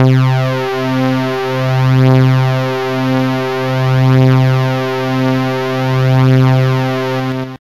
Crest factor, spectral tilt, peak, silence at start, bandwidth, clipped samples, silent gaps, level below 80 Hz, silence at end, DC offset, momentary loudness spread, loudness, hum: 10 dB; -7.5 dB/octave; -2 dBFS; 0 s; 12 kHz; under 0.1%; none; -46 dBFS; 0.1 s; 1%; 7 LU; -13 LUFS; none